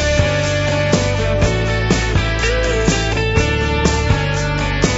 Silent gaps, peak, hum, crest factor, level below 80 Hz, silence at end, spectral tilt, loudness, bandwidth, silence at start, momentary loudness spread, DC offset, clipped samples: none; 0 dBFS; none; 16 dB; -22 dBFS; 0 s; -5 dB/octave; -16 LUFS; 8 kHz; 0 s; 2 LU; under 0.1%; under 0.1%